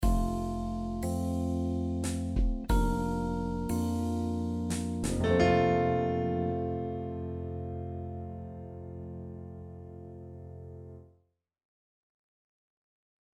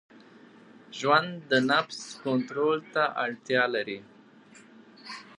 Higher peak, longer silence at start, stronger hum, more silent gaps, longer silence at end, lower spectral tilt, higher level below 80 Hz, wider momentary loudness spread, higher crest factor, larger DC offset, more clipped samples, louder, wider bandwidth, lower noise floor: second, -12 dBFS vs -8 dBFS; second, 0 s vs 0.9 s; neither; neither; first, 2.35 s vs 0.05 s; first, -7 dB/octave vs -4.5 dB/octave; first, -40 dBFS vs -82 dBFS; about the same, 19 LU vs 18 LU; about the same, 20 dB vs 22 dB; neither; neither; second, -32 LUFS vs -27 LUFS; first, 15.5 kHz vs 10.5 kHz; first, -73 dBFS vs -54 dBFS